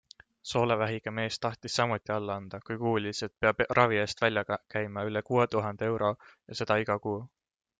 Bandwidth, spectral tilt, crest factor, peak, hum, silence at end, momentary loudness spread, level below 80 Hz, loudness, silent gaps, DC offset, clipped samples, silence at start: 9.4 kHz; -5 dB/octave; 22 dB; -8 dBFS; none; 0.5 s; 10 LU; -64 dBFS; -30 LUFS; none; under 0.1%; under 0.1%; 0.45 s